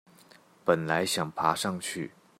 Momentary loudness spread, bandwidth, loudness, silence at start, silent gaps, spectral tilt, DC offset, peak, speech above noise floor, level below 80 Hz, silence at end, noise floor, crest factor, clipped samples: 8 LU; 16 kHz; -29 LUFS; 0.65 s; none; -4 dB/octave; under 0.1%; -8 dBFS; 29 dB; -70 dBFS; 0.3 s; -58 dBFS; 22 dB; under 0.1%